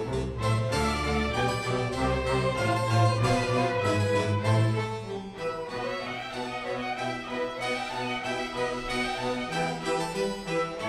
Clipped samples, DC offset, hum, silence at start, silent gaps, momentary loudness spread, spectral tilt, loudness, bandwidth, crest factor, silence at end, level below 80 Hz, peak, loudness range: under 0.1%; under 0.1%; none; 0 s; none; 8 LU; -5.5 dB/octave; -28 LUFS; 13 kHz; 16 dB; 0 s; -44 dBFS; -12 dBFS; 6 LU